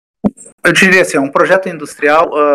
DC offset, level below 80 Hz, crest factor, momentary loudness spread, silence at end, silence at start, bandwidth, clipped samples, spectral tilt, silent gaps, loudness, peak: under 0.1%; -50 dBFS; 12 dB; 12 LU; 0 s; 0.25 s; 19 kHz; 1%; -4 dB/octave; 0.52-0.58 s; -11 LUFS; 0 dBFS